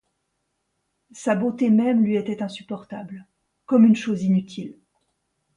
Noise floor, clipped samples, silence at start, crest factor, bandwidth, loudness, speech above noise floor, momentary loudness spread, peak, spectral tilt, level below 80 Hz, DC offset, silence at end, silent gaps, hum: -75 dBFS; under 0.1%; 1.15 s; 16 dB; 9.8 kHz; -21 LUFS; 54 dB; 19 LU; -6 dBFS; -7.5 dB/octave; -68 dBFS; under 0.1%; 0.85 s; none; none